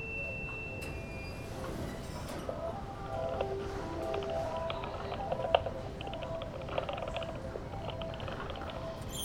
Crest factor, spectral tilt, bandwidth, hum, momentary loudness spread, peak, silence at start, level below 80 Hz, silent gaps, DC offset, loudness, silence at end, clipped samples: 28 dB; -5.5 dB/octave; 19.5 kHz; none; 6 LU; -10 dBFS; 0 s; -48 dBFS; none; under 0.1%; -38 LUFS; 0 s; under 0.1%